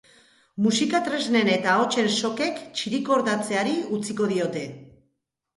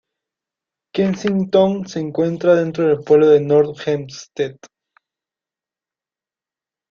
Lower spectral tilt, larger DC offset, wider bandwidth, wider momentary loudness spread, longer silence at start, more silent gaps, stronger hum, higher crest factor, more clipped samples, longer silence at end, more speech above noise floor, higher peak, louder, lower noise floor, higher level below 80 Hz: second, -4 dB/octave vs -7 dB/octave; neither; first, 11.5 kHz vs 7.2 kHz; second, 8 LU vs 13 LU; second, 0.55 s vs 0.95 s; neither; neither; about the same, 16 dB vs 16 dB; neither; second, 0.75 s vs 2.4 s; second, 52 dB vs over 74 dB; second, -8 dBFS vs -2 dBFS; second, -24 LUFS vs -17 LUFS; second, -75 dBFS vs under -90 dBFS; second, -68 dBFS vs -60 dBFS